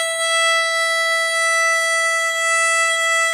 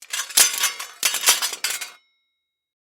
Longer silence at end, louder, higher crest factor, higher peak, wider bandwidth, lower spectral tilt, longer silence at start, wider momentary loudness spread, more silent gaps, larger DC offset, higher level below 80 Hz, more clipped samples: second, 0 s vs 0.85 s; first, -16 LUFS vs -19 LUFS; second, 10 dB vs 24 dB; second, -8 dBFS vs 0 dBFS; second, 15.5 kHz vs over 20 kHz; second, 5.5 dB/octave vs 4 dB/octave; about the same, 0 s vs 0 s; second, 2 LU vs 11 LU; neither; neither; second, under -90 dBFS vs -84 dBFS; neither